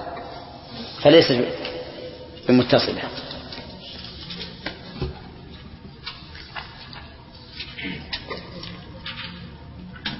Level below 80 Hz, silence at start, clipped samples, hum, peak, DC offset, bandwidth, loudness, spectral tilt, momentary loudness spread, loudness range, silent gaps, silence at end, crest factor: -46 dBFS; 0 s; under 0.1%; none; -2 dBFS; under 0.1%; 6 kHz; -23 LUFS; -8.5 dB/octave; 23 LU; 15 LU; none; 0 s; 24 dB